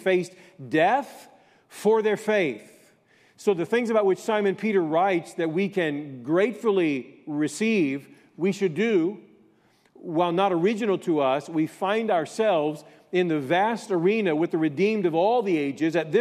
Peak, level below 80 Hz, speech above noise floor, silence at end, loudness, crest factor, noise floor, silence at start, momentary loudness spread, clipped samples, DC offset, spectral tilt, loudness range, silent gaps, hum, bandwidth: -10 dBFS; -78 dBFS; 38 dB; 0 s; -24 LUFS; 16 dB; -61 dBFS; 0 s; 7 LU; under 0.1%; under 0.1%; -6 dB/octave; 2 LU; none; none; 14.5 kHz